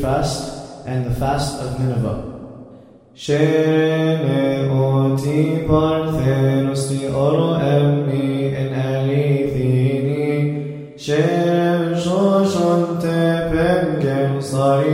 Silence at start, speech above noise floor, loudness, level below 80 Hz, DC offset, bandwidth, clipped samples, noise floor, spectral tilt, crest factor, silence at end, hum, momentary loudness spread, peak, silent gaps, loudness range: 0 s; 26 dB; -18 LUFS; -40 dBFS; under 0.1%; 14 kHz; under 0.1%; -43 dBFS; -7 dB/octave; 16 dB; 0 s; none; 8 LU; -2 dBFS; none; 3 LU